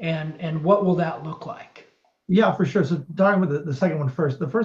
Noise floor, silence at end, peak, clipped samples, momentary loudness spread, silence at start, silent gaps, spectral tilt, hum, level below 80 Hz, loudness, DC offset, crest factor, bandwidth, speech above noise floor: -55 dBFS; 0 s; -6 dBFS; under 0.1%; 14 LU; 0 s; none; -8.5 dB/octave; none; -66 dBFS; -22 LUFS; under 0.1%; 16 dB; 7.2 kHz; 33 dB